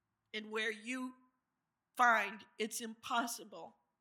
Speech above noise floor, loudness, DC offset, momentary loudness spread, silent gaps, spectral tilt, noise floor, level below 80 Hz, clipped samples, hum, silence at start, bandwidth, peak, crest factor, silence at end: 51 dB; -37 LUFS; under 0.1%; 20 LU; none; -1.5 dB/octave; -89 dBFS; under -90 dBFS; under 0.1%; none; 0.35 s; 17.5 kHz; -16 dBFS; 24 dB; 0.3 s